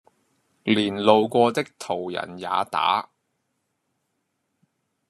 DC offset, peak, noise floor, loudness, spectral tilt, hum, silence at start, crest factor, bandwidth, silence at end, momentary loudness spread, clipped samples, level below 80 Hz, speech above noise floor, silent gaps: under 0.1%; -2 dBFS; -76 dBFS; -23 LUFS; -5 dB/octave; none; 0.65 s; 24 dB; 13 kHz; 2.1 s; 12 LU; under 0.1%; -72 dBFS; 54 dB; none